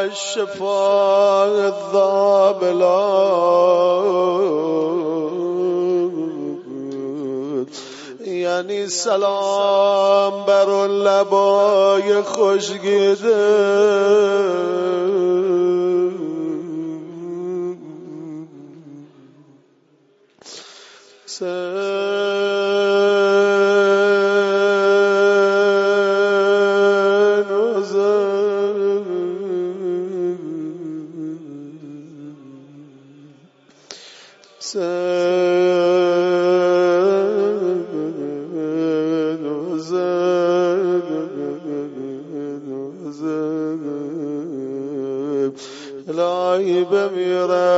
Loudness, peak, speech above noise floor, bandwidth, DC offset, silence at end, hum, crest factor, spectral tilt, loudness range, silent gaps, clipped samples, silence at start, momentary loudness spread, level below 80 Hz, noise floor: -18 LUFS; -4 dBFS; 40 dB; 8 kHz; under 0.1%; 0 s; none; 14 dB; -5 dB/octave; 14 LU; none; under 0.1%; 0 s; 15 LU; -74 dBFS; -56 dBFS